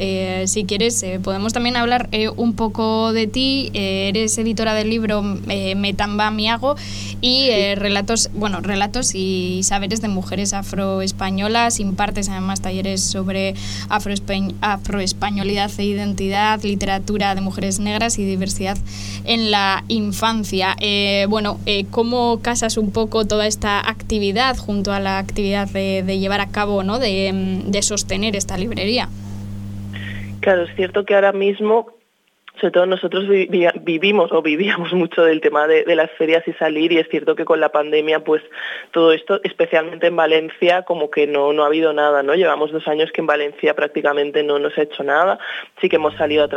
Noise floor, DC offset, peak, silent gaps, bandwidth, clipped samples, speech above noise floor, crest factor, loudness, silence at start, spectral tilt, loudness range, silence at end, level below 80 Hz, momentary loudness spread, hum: -62 dBFS; under 0.1%; -2 dBFS; none; 16 kHz; under 0.1%; 44 dB; 18 dB; -18 LUFS; 0 s; -4 dB/octave; 4 LU; 0 s; -36 dBFS; 7 LU; none